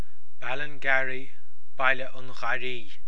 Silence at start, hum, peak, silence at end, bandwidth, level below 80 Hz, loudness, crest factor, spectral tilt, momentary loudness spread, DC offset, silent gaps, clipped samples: 0.4 s; none; -6 dBFS; 0 s; 11 kHz; -68 dBFS; -29 LUFS; 24 dB; -4.5 dB/octave; 14 LU; 10%; none; under 0.1%